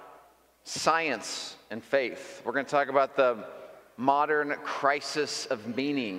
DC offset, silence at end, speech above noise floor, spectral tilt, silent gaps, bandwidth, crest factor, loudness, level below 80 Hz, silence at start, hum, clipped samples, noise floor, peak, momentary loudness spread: under 0.1%; 0 s; 30 dB; -3 dB/octave; none; 16 kHz; 22 dB; -29 LUFS; -76 dBFS; 0 s; none; under 0.1%; -59 dBFS; -8 dBFS; 13 LU